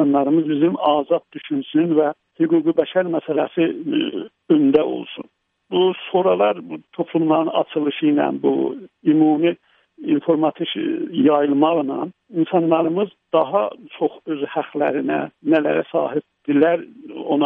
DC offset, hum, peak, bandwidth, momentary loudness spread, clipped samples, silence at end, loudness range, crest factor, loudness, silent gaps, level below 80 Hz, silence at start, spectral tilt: under 0.1%; none; -2 dBFS; 3.8 kHz; 10 LU; under 0.1%; 0 s; 2 LU; 16 dB; -19 LUFS; none; -68 dBFS; 0 s; -10 dB/octave